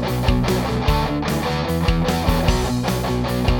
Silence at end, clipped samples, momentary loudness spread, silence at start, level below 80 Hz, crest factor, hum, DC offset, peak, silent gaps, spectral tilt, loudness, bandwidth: 0 s; under 0.1%; 3 LU; 0 s; -26 dBFS; 16 dB; none; under 0.1%; -2 dBFS; none; -6 dB/octave; -20 LUFS; 19 kHz